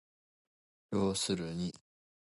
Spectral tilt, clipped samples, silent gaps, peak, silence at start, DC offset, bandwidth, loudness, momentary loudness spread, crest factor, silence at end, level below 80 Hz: -4.5 dB/octave; under 0.1%; none; -20 dBFS; 0.9 s; under 0.1%; 12 kHz; -35 LUFS; 8 LU; 18 dB; 0.5 s; -62 dBFS